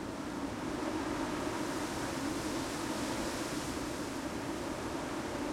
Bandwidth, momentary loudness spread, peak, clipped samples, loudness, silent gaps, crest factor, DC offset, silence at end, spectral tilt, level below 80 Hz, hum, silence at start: 16.5 kHz; 3 LU; -22 dBFS; under 0.1%; -37 LUFS; none; 14 dB; under 0.1%; 0 s; -4 dB/octave; -54 dBFS; none; 0 s